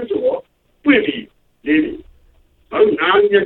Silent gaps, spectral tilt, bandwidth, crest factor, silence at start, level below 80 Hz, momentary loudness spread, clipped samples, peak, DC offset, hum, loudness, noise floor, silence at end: none; -8 dB/octave; 4.2 kHz; 16 dB; 0 s; -50 dBFS; 16 LU; under 0.1%; 0 dBFS; under 0.1%; none; -16 LUFS; -53 dBFS; 0 s